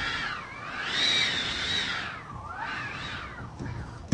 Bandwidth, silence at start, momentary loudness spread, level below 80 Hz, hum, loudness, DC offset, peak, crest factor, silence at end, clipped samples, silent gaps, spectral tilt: 11.5 kHz; 0 s; 16 LU; -50 dBFS; none; -29 LUFS; under 0.1%; -10 dBFS; 22 dB; 0 s; under 0.1%; none; -2 dB/octave